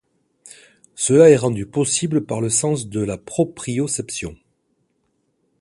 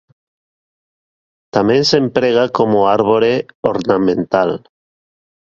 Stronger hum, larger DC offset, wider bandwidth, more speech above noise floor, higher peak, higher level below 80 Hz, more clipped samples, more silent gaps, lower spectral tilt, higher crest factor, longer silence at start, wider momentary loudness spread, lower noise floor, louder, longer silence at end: neither; neither; first, 11.5 kHz vs 7.4 kHz; second, 50 dB vs over 76 dB; about the same, 0 dBFS vs 0 dBFS; about the same, -52 dBFS vs -52 dBFS; neither; second, none vs 3.55-3.63 s; about the same, -5 dB/octave vs -5.5 dB/octave; about the same, 20 dB vs 16 dB; second, 0.95 s vs 1.55 s; first, 13 LU vs 6 LU; second, -68 dBFS vs under -90 dBFS; second, -19 LUFS vs -14 LUFS; first, 1.25 s vs 1 s